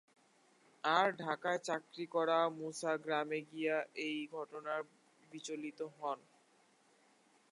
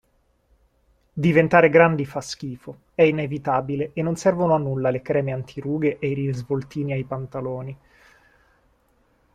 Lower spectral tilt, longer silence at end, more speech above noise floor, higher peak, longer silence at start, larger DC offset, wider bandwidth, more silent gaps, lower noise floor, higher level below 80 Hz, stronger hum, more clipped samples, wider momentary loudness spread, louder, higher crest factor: second, -4 dB/octave vs -7 dB/octave; second, 1.35 s vs 1.6 s; second, 33 dB vs 43 dB; second, -18 dBFS vs -2 dBFS; second, 0.85 s vs 1.15 s; neither; about the same, 11.5 kHz vs 10.5 kHz; neither; first, -71 dBFS vs -65 dBFS; second, under -90 dBFS vs -56 dBFS; neither; neither; second, 13 LU vs 16 LU; second, -38 LUFS vs -22 LUFS; about the same, 22 dB vs 20 dB